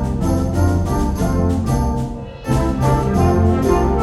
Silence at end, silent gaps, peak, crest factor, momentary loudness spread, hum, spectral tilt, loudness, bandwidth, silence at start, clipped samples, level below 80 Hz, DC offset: 0 s; none; -2 dBFS; 14 dB; 6 LU; none; -7.5 dB/octave; -18 LUFS; 12.5 kHz; 0 s; under 0.1%; -24 dBFS; under 0.1%